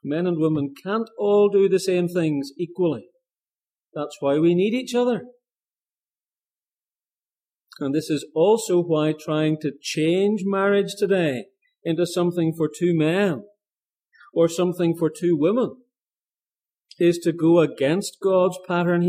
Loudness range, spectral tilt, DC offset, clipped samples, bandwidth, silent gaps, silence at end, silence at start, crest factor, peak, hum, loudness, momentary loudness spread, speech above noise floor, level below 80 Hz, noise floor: 4 LU; -6.5 dB/octave; under 0.1%; under 0.1%; 15.5 kHz; 5.60-5.64 s, 6.20-6.24 s; 0 s; 0.05 s; 16 dB; -6 dBFS; none; -22 LUFS; 8 LU; over 69 dB; -72 dBFS; under -90 dBFS